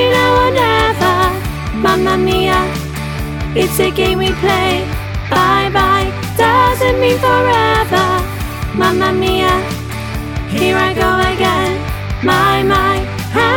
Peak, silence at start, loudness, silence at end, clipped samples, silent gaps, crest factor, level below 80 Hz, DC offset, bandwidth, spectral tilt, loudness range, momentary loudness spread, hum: -2 dBFS; 0 s; -13 LUFS; 0 s; under 0.1%; none; 12 dB; -26 dBFS; under 0.1%; 19.5 kHz; -5 dB/octave; 3 LU; 10 LU; none